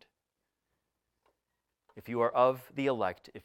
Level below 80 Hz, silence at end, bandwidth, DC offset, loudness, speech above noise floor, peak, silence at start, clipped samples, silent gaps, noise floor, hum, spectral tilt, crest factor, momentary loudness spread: -78 dBFS; 0.05 s; 16.5 kHz; under 0.1%; -31 LUFS; 56 dB; -14 dBFS; 1.95 s; under 0.1%; none; -86 dBFS; none; -7 dB/octave; 22 dB; 9 LU